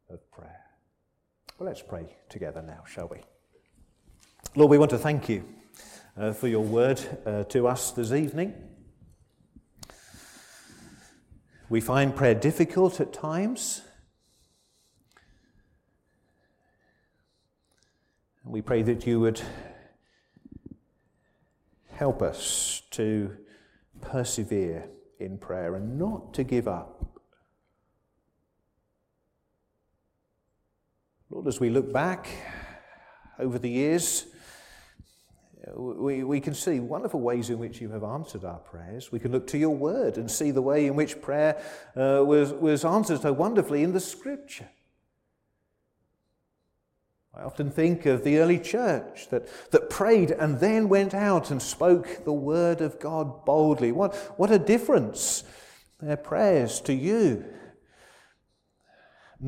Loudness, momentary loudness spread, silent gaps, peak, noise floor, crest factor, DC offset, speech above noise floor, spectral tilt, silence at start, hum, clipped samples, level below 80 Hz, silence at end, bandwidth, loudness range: -26 LUFS; 18 LU; none; -6 dBFS; -76 dBFS; 22 dB; under 0.1%; 50 dB; -5.5 dB/octave; 0.1 s; none; under 0.1%; -56 dBFS; 0 s; 16.5 kHz; 11 LU